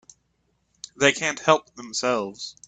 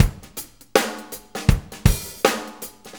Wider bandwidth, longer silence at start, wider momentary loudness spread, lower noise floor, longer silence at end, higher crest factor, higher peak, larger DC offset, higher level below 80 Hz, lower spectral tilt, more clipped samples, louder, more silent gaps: second, 9.4 kHz vs over 20 kHz; first, 1 s vs 0 s; about the same, 16 LU vs 14 LU; first, -70 dBFS vs -39 dBFS; first, 0.15 s vs 0 s; about the same, 24 dB vs 22 dB; about the same, -2 dBFS vs 0 dBFS; neither; second, -64 dBFS vs -28 dBFS; second, -2.5 dB/octave vs -4.5 dB/octave; neither; about the same, -23 LUFS vs -22 LUFS; neither